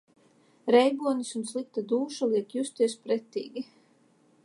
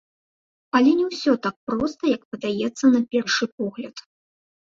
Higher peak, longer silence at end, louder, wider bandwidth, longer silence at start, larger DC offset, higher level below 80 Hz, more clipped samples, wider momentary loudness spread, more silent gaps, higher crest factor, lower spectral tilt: about the same, -8 dBFS vs -6 dBFS; first, 0.8 s vs 0.65 s; second, -28 LUFS vs -22 LUFS; first, 11.5 kHz vs 7.6 kHz; about the same, 0.65 s vs 0.75 s; neither; second, -86 dBFS vs -62 dBFS; neither; first, 15 LU vs 11 LU; second, none vs 1.56-1.67 s, 2.25-2.32 s, 3.52-3.58 s; about the same, 22 dB vs 18 dB; about the same, -4 dB/octave vs -4.5 dB/octave